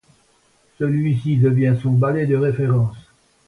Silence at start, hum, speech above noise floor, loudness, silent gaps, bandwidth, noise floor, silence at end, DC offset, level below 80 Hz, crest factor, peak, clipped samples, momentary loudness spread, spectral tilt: 0.8 s; none; 41 dB; -19 LUFS; none; 4 kHz; -59 dBFS; 0.45 s; under 0.1%; -52 dBFS; 12 dB; -6 dBFS; under 0.1%; 5 LU; -10 dB/octave